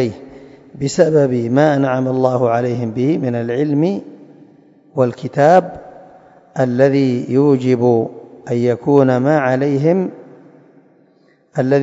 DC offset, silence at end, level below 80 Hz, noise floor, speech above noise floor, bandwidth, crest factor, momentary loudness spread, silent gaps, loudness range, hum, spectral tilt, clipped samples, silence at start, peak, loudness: under 0.1%; 0 s; -58 dBFS; -54 dBFS; 39 dB; 7.8 kHz; 16 dB; 13 LU; none; 3 LU; none; -7.5 dB/octave; under 0.1%; 0 s; 0 dBFS; -15 LUFS